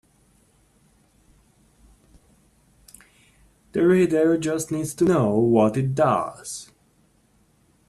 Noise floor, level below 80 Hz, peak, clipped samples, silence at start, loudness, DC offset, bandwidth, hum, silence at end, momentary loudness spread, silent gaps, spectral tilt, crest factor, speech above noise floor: -61 dBFS; -58 dBFS; -4 dBFS; under 0.1%; 3.75 s; -21 LUFS; under 0.1%; 13 kHz; none; 1.25 s; 13 LU; none; -6.5 dB/octave; 20 dB; 41 dB